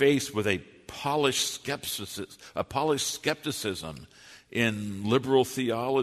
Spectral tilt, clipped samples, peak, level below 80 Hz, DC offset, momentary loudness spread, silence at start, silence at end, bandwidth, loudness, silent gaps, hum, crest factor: -4 dB/octave; under 0.1%; -10 dBFS; -62 dBFS; under 0.1%; 13 LU; 0 s; 0 s; 13.5 kHz; -28 LUFS; none; none; 20 dB